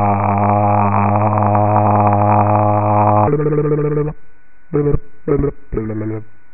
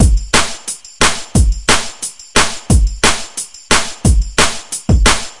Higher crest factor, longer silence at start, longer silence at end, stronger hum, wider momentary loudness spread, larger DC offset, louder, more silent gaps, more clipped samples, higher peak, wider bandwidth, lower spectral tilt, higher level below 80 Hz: about the same, 14 dB vs 14 dB; about the same, 0 s vs 0 s; first, 0.25 s vs 0.05 s; neither; about the same, 10 LU vs 11 LU; first, 3% vs under 0.1%; about the same, -15 LUFS vs -14 LUFS; neither; second, under 0.1% vs 0.2%; about the same, 0 dBFS vs 0 dBFS; second, 2.8 kHz vs 12 kHz; first, -6 dB/octave vs -3 dB/octave; second, -34 dBFS vs -18 dBFS